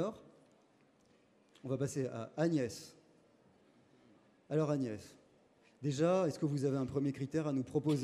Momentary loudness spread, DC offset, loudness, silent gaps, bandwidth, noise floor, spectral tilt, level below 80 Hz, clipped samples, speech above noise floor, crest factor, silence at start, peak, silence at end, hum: 16 LU; under 0.1%; -36 LUFS; none; 14 kHz; -69 dBFS; -7 dB/octave; -74 dBFS; under 0.1%; 34 dB; 18 dB; 0 s; -20 dBFS; 0 s; none